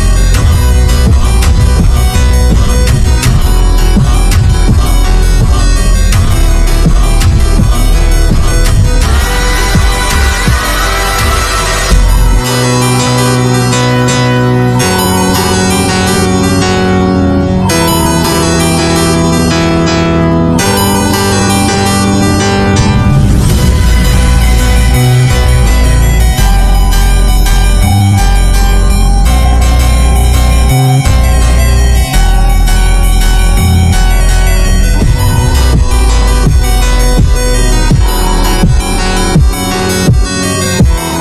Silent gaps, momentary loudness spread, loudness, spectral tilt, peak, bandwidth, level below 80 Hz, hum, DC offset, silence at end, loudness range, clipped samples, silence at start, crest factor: none; 2 LU; -9 LUFS; -5 dB/octave; 0 dBFS; 14 kHz; -8 dBFS; none; under 0.1%; 0 s; 1 LU; 0.7%; 0 s; 6 dB